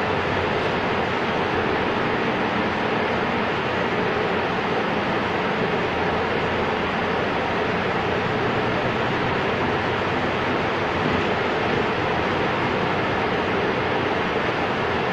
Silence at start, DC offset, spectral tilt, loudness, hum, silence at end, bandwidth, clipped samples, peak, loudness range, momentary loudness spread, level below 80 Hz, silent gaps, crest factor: 0 s; under 0.1%; -6 dB/octave; -22 LUFS; none; 0 s; 10.5 kHz; under 0.1%; -10 dBFS; 0 LU; 1 LU; -46 dBFS; none; 14 dB